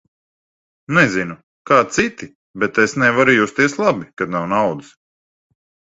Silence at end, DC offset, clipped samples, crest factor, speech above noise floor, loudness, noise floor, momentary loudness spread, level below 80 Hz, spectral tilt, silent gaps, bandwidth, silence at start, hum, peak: 1.15 s; under 0.1%; under 0.1%; 18 dB; over 73 dB; -16 LUFS; under -90 dBFS; 14 LU; -54 dBFS; -5 dB/octave; 1.43-1.65 s, 2.35-2.54 s; 8.2 kHz; 0.9 s; none; 0 dBFS